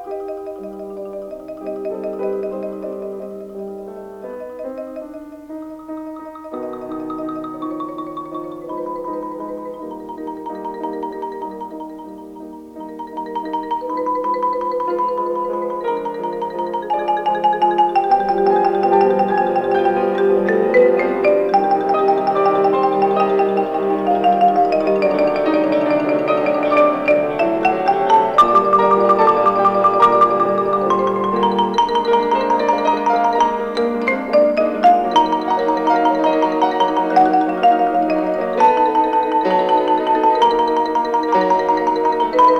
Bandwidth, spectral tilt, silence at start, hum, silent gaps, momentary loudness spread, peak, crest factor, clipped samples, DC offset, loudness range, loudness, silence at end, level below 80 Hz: 10 kHz; -6 dB/octave; 0 s; none; none; 17 LU; -2 dBFS; 14 dB; under 0.1%; under 0.1%; 14 LU; -16 LUFS; 0 s; -50 dBFS